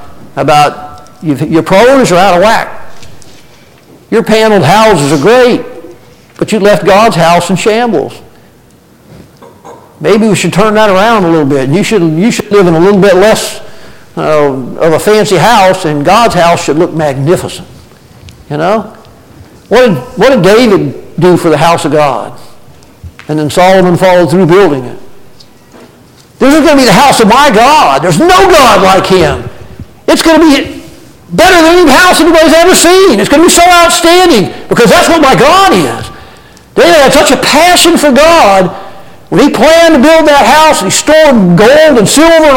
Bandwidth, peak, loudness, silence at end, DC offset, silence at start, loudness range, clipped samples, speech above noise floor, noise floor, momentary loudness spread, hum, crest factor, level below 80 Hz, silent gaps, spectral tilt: 17.5 kHz; 0 dBFS; -5 LUFS; 0 s; under 0.1%; 0 s; 6 LU; 0.6%; 35 dB; -40 dBFS; 11 LU; none; 6 dB; -32 dBFS; none; -4.5 dB/octave